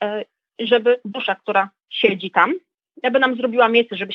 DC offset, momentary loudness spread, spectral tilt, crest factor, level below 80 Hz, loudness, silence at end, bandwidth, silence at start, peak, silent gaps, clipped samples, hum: under 0.1%; 11 LU; -6.5 dB/octave; 20 dB; -84 dBFS; -19 LUFS; 0 s; 5.6 kHz; 0 s; 0 dBFS; none; under 0.1%; none